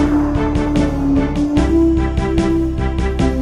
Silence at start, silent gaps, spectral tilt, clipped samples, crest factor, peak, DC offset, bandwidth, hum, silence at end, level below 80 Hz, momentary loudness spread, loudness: 0 s; none; -7.5 dB/octave; under 0.1%; 12 dB; -2 dBFS; under 0.1%; 11 kHz; none; 0 s; -22 dBFS; 4 LU; -16 LUFS